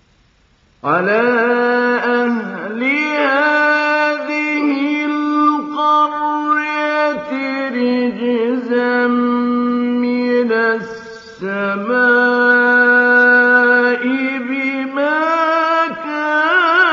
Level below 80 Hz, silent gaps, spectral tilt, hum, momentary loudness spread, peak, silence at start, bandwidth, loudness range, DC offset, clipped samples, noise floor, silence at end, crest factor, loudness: -66 dBFS; none; -5.5 dB/octave; none; 9 LU; 0 dBFS; 0.85 s; 7.2 kHz; 5 LU; under 0.1%; under 0.1%; -54 dBFS; 0 s; 14 dB; -14 LUFS